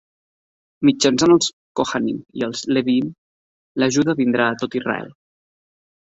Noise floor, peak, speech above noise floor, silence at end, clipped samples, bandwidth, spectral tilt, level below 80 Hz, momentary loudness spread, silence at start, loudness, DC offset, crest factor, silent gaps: under -90 dBFS; -2 dBFS; over 72 dB; 0.9 s; under 0.1%; 8 kHz; -4 dB/octave; -58 dBFS; 11 LU; 0.8 s; -19 LUFS; under 0.1%; 18 dB; 1.53-1.75 s, 3.18-3.75 s